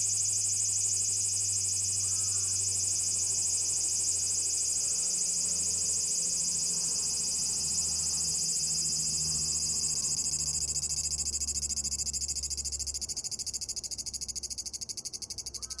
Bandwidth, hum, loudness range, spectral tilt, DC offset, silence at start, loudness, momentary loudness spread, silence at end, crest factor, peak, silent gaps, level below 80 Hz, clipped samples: 12 kHz; none; 5 LU; 0 dB/octave; under 0.1%; 0 s; -28 LUFS; 8 LU; 0 s; 16 dB; -16 dBFS; none; -54 dBFS; under 0.1%